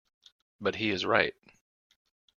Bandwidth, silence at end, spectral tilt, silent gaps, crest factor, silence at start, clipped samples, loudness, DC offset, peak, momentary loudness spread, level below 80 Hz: 7.2 kHz; 1.1 s; -4.5 dB/octave; none; 26 dB; 0.6 s; under 0.1%; -29 LUFS; under 0.1%; -6 dBFS; 8 LU; -68 dBFS